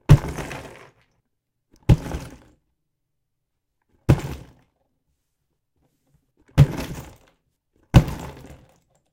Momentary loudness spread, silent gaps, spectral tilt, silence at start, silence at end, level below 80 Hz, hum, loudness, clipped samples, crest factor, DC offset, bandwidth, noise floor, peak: 21 LU; none; -7.5 dB/octave; 0.1 s; 0.8 s; -32 dBFS; none; -21 LUFS; under 0.1%; 24 dB; under 0.1%; 16.5 kHz; -78 dBFS; 0 dBFS